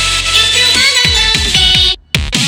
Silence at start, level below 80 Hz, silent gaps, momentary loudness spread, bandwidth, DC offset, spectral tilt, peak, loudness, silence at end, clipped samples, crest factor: 0 s; -24 dBFS; none; 4 LU; over 20 kHz; under 0.1%; -1 dB/octave; 0 dBFS; -8 LUFS; 0 s; under 0.1%; 10 dB